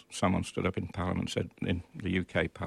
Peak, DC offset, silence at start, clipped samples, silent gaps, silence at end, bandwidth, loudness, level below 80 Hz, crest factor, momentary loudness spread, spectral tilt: -14 dBFS; under 0.1%; 0.1 s; under 0.1%; none; 0 s; 12.5 kHz; -33 LUFS; -52 dBFS; 18 dB; 5 LU; -6 dB/octave